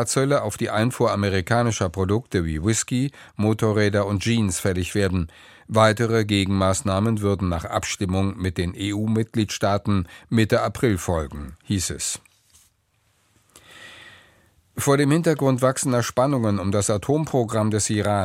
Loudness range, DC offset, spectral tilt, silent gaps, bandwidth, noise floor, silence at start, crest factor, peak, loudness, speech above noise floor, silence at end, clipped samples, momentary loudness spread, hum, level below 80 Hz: 6 LU; under 0.1%; -5.5 dB/octave; none; 16 kHz; -66 dBFS; 0 s; 20 dB; -2 dBFS; -22 LUFS; 44 dB; 0 s; under 0.1%; 6 LU; none; -46 dBFS